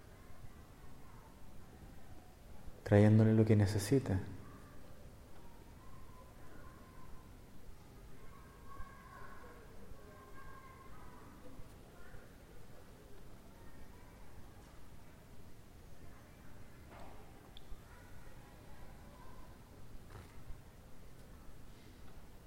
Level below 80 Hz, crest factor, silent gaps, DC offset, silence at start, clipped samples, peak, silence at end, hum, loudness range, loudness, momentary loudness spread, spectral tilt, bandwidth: -58 dBFS; 26 dB; none; under 0.1%; 0 s; under 0.1%; -14 dBFS; 0 s; none; 25 LU; -31 LUFS; 25 LU; -7.5 dB/octave; 16 kHz